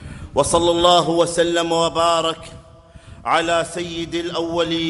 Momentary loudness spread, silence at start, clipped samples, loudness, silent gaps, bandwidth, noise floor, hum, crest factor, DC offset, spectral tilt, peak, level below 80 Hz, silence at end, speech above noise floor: 11 LU; 0 s; under 0.1%; -18 LUFS; none; 11.5 kHz; -44 dBFS; none; 18 dB; under 0.1%; -3.5 dB/octave; 0 dBFS; -44 dBFS; 0 s; 25 dB